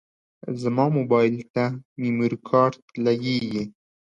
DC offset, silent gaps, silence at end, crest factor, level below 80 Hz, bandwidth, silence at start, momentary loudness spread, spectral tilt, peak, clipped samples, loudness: under 0.1%; 1.50-1.54 s, 1.85-1.96 s, 2.82-2.88 s; 0.35 s; 18 dB; -64 dBFS; 8.4 kHz; 0.45 s; 10 LU; -7.5 dB/octave; -6 dBFS; under 0.1%; -23 LUFS